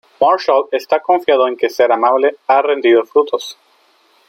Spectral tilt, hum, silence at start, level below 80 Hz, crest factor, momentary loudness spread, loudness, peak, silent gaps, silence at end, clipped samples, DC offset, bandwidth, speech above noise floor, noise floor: -3.5 dB/octave; none; 0.2 s; -66 dBFS; 12 dB; 5 LU; -14 LUFS; -2 dBFS; none; 0.75 s; under 0.1%; under 0.1%; 16.5 kHz; 41 dB; -54 dBFS